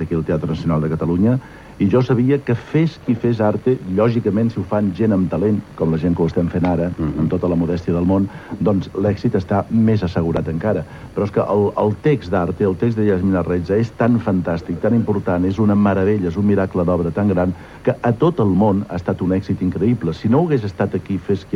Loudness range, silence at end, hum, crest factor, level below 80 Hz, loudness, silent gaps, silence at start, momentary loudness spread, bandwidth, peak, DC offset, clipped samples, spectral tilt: 1 LU; 0 s; none; 14 dB; -42 dBFS; -18 LUFS; none; 0 s; 5 LU; 10.5 kHz; -4 dBFS; under 0.1%; under 0.1%; -9.5 dB/octave